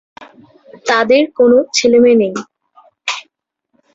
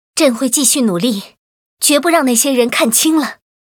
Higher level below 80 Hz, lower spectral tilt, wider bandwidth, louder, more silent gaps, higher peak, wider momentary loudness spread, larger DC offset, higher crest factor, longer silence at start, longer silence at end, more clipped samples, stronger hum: first, -58 dBFS vs -64 dBFS; about the same, -3.5 dB/octave vs -2.5 dB/octave; second, 8 kHz vs over 20 kHz; about the same, -12 LUFS vs -12 LUFS; second, none vs 1.38-1.77 s; about the same, -2 dBFS vs 0 dBFS; first, 15 LU vs 6 LU; neither; about the same, 14 dB vs 14 dB; about the same, 0.2 s vs 0.15 s; first, 0.75 s vs 0.45 s; neither; neither